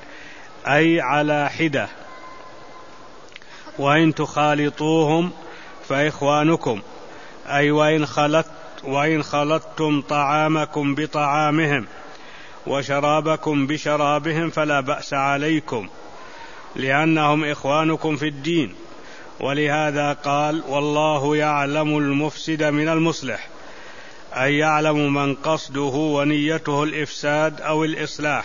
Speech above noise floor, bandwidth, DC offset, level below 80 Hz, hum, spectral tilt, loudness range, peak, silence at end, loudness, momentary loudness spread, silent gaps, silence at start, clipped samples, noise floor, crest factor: 23 dB; 7.4 kHz; 0.9%; -58 dBFS; none; -5.5 dB/octave; 2 LU; -2 dBFS; 0 s; -20 LUFS; 21 LU; none; 0 s; under 0.1%; -43 dBFS; 18 dB